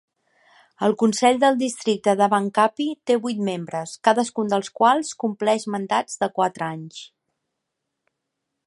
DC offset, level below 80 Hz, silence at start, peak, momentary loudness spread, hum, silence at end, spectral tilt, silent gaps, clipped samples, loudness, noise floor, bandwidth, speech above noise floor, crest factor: under 0.1%; -74 dBFS; 0.8 s; -2 dBFS; 10 LU; none; 1.6 s; -4.5 dB/octave; none; under 0.1%; -21 LUFS; -80 dBFS; 11.5 kHz; 59 dB; 20 dB